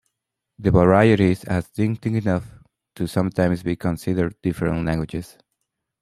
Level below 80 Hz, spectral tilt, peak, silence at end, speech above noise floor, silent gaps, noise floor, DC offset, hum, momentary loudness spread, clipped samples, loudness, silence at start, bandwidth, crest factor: -44 dBFS; -8 dB/octave; -2 dBFS; 0.75 s; 61 dB; none; -81 dBFS; under 0.1%; none; 11 LU; under 0.1%; -21 LUFS; 0.6 s; 14.5 kHz; 20 dB